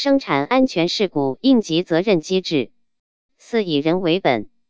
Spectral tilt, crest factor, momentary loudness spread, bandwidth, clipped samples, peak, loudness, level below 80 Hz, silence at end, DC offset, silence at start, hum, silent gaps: -5.5 dB/octave; 16 dB; 6 LU; 8 kHz; under 0.1%; -4 dBFS; -19 LUFS; -60 dBFS; 0.25 s; 0.5%; 0 s; none; 2.99-3.29 s